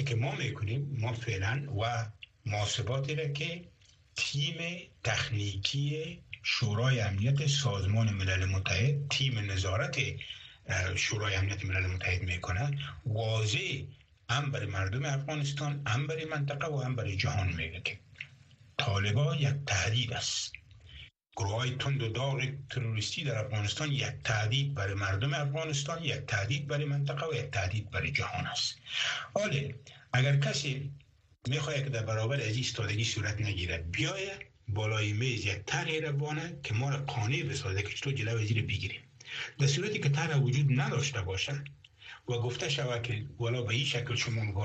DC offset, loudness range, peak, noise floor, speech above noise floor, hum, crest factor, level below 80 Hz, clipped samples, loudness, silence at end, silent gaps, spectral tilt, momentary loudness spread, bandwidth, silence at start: under 0.1%; 3 LU; -12 dBFS; -58 dBFS; 26 dB; none; 22 dB; -58 dBFS; under 0.1%; -32 LUFS; 0 s; none; -4.5 dB/octave; 8 LU; 8.4 kHz; 0 s